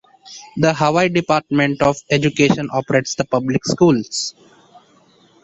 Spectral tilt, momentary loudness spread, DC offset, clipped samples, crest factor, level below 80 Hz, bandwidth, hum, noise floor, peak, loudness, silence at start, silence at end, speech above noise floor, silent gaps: -5 dB/octave; 8 LU; under 0.1%; under 0.1%; 16 dB; -52 dBFS; 8.4 kHz; none; -53 dBFS; -2 dBFS; -17 LUFS; 0.25 s; 1.1 s; 36 dB; none